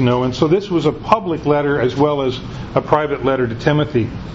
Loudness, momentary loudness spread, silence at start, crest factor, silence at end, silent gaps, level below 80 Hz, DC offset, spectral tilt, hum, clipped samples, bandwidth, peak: -17 LUFS; 5 LU; 0 s; 16 dB; 0 s; none; -40 dBFS; under 0.1%; -7.5 dB/octave; none; under 0.1%; 7.8 kHz; 0 dBFS